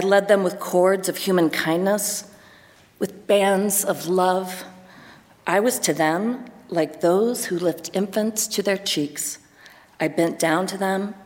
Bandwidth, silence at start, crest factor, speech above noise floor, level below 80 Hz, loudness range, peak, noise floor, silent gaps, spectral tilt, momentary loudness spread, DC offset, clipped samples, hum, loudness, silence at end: 17 kHz; 0 s; 18 dB; 30 dB; -68 dBFS; 2 LU; -4 dBFS; -51 dBFS; none; -4 dB/octave; 10 LU; under 0.1%; under 0.1%; none; -22 LUFS; 0 s